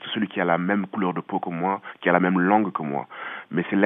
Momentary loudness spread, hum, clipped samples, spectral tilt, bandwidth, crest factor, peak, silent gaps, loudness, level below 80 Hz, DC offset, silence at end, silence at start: 10 LU; none; under 0.1%; -10.5 dB/octave; 3.8 kHz; 20 dB; -4 dBFS; none; -24 LUFS; -84 dBFS; under 0.1%; 0 s; 0 s